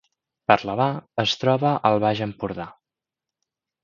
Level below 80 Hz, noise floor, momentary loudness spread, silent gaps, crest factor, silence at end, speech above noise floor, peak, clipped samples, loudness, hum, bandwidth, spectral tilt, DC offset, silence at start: -58 dBFS; -88 dBFS; 11 LU; none; 24 dB; 1.1 s; 66 dB; 0 dBFS; under 0.1%; -22 LUFS; none; 7.4 kHz; -6 dB/octave; under 0.1%; 0.5 s